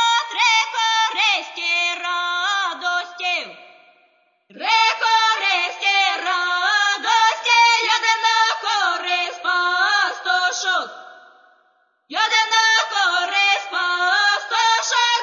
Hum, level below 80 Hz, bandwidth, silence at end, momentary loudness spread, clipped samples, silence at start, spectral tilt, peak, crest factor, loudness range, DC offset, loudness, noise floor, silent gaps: none; -78 dBFS; 7.4 kHz; 0 s; 7 LU; under 0.1%; 0 s; 3 dB/octave; -2 dBFS; 16 dB; 5 LU; under 0.1%; -17 LUFS; -62 dBFS; none